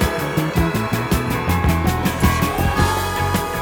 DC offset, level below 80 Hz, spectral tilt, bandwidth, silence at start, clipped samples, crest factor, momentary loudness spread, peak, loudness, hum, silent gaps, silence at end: under 0.1%; -26 dBFS; -5.5 dB/octave; 20 kHz; 0 s; under 0.1%; 16 dB; 2 LU; -4 dBFS; -19 LUFS; none; none; 0 s